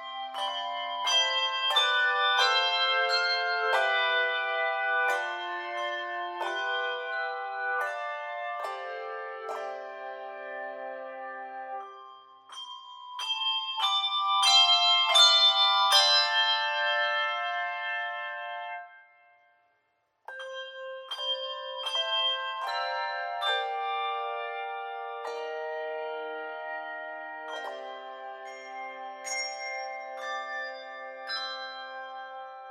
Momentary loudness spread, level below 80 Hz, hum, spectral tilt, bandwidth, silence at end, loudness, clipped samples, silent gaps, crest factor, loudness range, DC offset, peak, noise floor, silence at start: 20 LU; under -90 dBFS; none; 3.5 dB/octave; 15.5 kHz; 0 s; -27 LUFS; under 0.1%; none; 22 dB; 17 LU; under 0.1%; -8 dBFS; -74 dBFS; 0 s